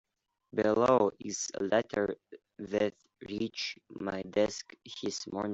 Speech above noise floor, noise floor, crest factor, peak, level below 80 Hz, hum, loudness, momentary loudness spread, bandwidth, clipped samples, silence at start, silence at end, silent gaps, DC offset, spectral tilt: 30 dB; -62 dBFS; 20 dB; -14 dBFS; -68 dBFS; none; -32 LUFS; 16 LU; 8.2 kHz; under 0.1%; 0.55 s; 0 s; none; under 0.1%; -4 dB/octave